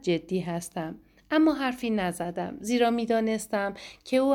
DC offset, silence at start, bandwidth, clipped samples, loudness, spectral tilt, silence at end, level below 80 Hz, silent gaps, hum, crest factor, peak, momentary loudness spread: under 0.1%; 0.05 s; 17 kHz; under 0.1%; -28 LUFS; -5.5 dB/octave; 0 s; -60 dBFS; none; none; 16 dB; -12 dBFS; 11 LU